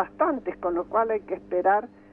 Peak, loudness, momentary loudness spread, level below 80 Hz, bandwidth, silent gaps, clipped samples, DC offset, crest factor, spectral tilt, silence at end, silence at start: -10 dBFS; -26 LUFS; 6 LU; -60 dBFS; 3.6 kHz; none; under 0.1%; under 0.1%; 16 dB; -9 dB/octave; 0.25 s; 0 s